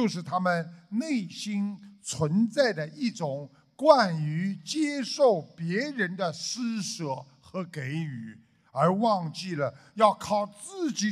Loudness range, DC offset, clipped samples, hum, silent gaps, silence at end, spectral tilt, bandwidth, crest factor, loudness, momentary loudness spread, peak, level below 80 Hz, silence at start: 4 LU; under 0.1%; under 0.1%; none; none; 0 s; -5 dB/octave; 13.5 kHz; 22 dB; -28 LUFS; 13 LU; -6 dBFS; -72 dBFS; 0 s